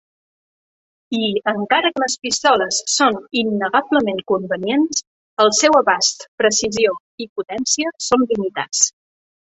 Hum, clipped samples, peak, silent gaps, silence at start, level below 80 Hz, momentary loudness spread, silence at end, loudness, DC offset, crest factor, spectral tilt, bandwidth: none; under 0.1%; -2 dBFS; 5.07-5.37 s, 6.28-6.38 s, 7.00-7.18 s, 7.29-7.36 s; 1.1 s; -60 dBFS; 8 LU; 0.7 s; -17 LUFS; under 0.1%; 18 dB; -2 dB/octave; 8.4 kHz